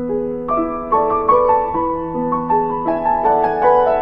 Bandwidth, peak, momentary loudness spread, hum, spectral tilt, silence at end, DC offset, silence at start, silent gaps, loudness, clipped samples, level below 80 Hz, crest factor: 5.4 kHz; 0 dBFS; 7 LU; none; -9.5 dB/octave; 0 s; under 0.1%; 0 s; none; -17 LUFS; under 0.1%; -40 dBFS; 16 dB